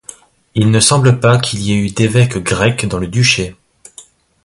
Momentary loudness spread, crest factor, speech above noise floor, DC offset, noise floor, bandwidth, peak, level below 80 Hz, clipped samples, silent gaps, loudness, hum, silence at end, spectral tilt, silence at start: 8 LU; 14 dB; 30 dB; under 0.1%; -42 dBFS; 11.5 kHz; 0 dBFS; -38 dBFS; under 0.1%; none; -13 LUFS; none; 0.45 s; -4.5 dB/octave; 0.55 s